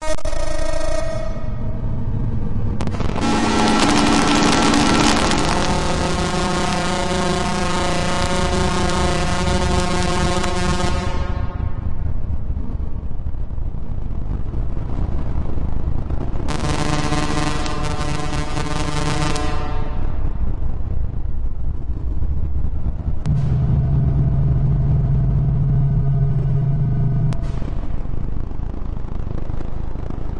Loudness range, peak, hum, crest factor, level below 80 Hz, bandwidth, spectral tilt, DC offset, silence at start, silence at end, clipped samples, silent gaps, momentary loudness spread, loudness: 10 LU; -2 dBFS; none; 16 dB; -24 dBFS; 11.5 kHz; -5.5 dB/octave; under 0.1%; 0 s; 0 s; under 0.1%; none; 13 LU; -21 LUFS